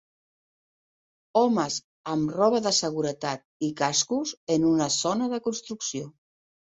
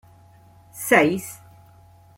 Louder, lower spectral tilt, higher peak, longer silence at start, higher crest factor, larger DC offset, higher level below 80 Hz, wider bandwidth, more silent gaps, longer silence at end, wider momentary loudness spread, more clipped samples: second, -26 LUFS vs -20 LUFS; about the same, -3.5 dB/octave vs -4.5 dB/octave; second, -8 dBFS vs -2 dBFS; first, 1.35 s vs 0.75 s; second, 18 dB vs 24 dB; neither; about the same, -66 dBFS vs -62 dBFS; second, 8.2 kHz vs 16.5 kHz; first, 1.84-2.04 s, 3.45-3.60 s, 4.37-4.47 s vs none; second, 0.55 s vs 0.85 s; second, 9 LU vs 26 LU; neither